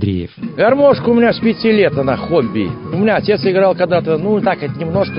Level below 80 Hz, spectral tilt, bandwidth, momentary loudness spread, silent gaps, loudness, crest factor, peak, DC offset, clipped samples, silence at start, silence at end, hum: -40 dBFS; -12 dB/octave; 5.4 kHz; 9 LU; none; -14 LUFS; 12 dB; -2 dBFS; under 0.1%; under 0.1%; 0 s; 0 s; none